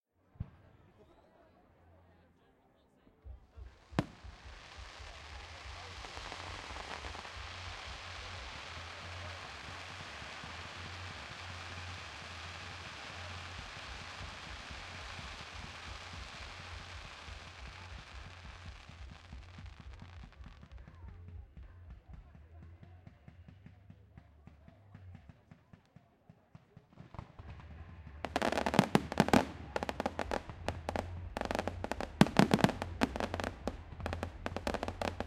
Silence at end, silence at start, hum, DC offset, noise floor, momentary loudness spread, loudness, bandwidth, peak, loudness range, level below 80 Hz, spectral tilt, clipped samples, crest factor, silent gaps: 0 s; 0.35 s; none; under 0.1%; -69 dBFS; 24 LU; -39 LUFS; 15.5 kHz; -4 dBFS; 23 LU; -54 dBFS; -5.5 dB/octave; under 0.1%; 38 dB; none